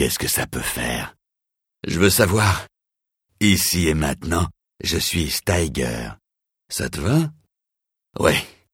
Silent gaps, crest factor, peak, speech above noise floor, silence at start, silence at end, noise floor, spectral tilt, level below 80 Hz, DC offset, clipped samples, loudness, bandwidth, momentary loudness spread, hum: none; 22 dB; 0 dBFS; 63 dB; 0 s; 0.25 s; -83 dBFS; -4 dB/octave; -38 dBFS; under 0.1%; under 0.1%; -21 LUFS; 17 kHz; 12 LU; none